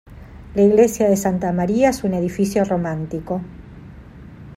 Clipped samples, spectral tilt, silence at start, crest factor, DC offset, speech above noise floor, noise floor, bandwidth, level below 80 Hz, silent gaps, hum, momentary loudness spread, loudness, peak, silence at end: under 0.1%; -6.5 dB/octave; 0.05 s; 18 dB; under 0.1%; 22 dB; -39 dBFS; 16 kHz; -44 dBFS; none; none; 13 LU; -19 LUFS; -2 dBFS; 0 s